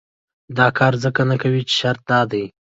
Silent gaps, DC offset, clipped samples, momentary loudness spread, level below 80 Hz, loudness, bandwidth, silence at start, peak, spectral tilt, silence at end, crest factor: none; under 0.1%; under 0.1%; 7 LU; -56 dBFS; -18 LUFS; 7.8 kHz; 0.5 s; -2 dBFS; -5.5 dB/octave; 0.3 s; 18 dB